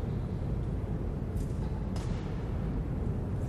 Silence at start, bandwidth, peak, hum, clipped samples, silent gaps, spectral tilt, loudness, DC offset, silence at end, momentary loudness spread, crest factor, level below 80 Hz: 0 s; 12 kHz; -20 dBFS; none; under 0.1%; none; -8.5 dB/octave; -35 LUFS; under 0.1%; 0 s; 1 LU; 12 dB; -38 dBFS